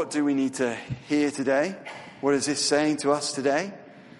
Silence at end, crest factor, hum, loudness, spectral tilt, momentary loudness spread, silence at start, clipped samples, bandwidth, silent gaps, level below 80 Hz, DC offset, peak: 0 s; 16 dB; none; -25 LUFS; -3.5 dB/octave; 13 LU; 0 s; under 0.1%; 11.5 kHz; none; -64 dBFS; under 0.1%; -10 dBFS